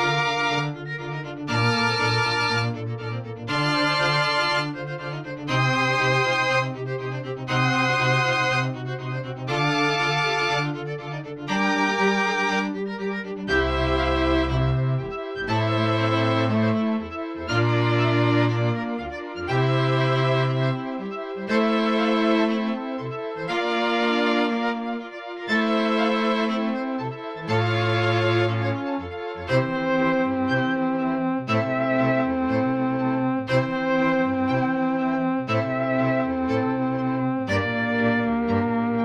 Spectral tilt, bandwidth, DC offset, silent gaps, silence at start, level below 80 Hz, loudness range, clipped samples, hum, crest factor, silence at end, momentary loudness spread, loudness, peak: -6 dB/octave; 10.5 kHz; under 0.1%; none; 0 s; -44 dBFS; 2 LU; under 0.1%; none; 14 dB; 0 s; 10 LU; -23 LUFS; -8 dBFS